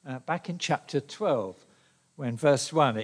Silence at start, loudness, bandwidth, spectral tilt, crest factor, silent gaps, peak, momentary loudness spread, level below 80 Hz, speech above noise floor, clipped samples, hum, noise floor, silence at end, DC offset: 0.05 s; -28 LUFS; 10.5 kHz; -5 dB/octave; 20 dB; none; -8 dBFS; 11 LU; -78 dBFS; 36 dB; under 0.1%; none; -64 dBFS; 0 s; under 0.1%